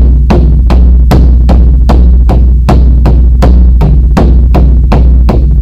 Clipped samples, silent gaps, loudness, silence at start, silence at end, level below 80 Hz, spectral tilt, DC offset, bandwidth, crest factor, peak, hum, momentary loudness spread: 10%; none; -6 LUFS; 0 s; 0 s; -4 dBFS; -9 dB/octave; under 0.1%; 5.4 kHz; 2 dB; 0 dBFS; none; 1 LU